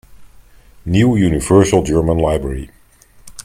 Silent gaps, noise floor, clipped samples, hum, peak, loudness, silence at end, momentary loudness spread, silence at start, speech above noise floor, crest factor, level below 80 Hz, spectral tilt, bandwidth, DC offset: none; -46 dBFS; under 0.1%; none; 0 dBFS; -14 LUFS; 0.05 s; 17 LU; 0.2 s; 33 dB; 16 dB; -32 dBFS; -6.5 dB/octave; 16 kHz; under 0.1%